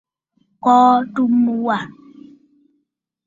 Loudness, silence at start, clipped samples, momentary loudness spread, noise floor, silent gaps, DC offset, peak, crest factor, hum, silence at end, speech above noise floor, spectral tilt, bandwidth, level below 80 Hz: -16 LUFS; 0.65 s; under 0.1%; 11 LU; -72 dBFS; none; under 0.1%; -2 dBFS; 16 dB; none; 1.35 s; 57 dB; -6.5 dB/octave; 7.4 kHz; -66 dBFS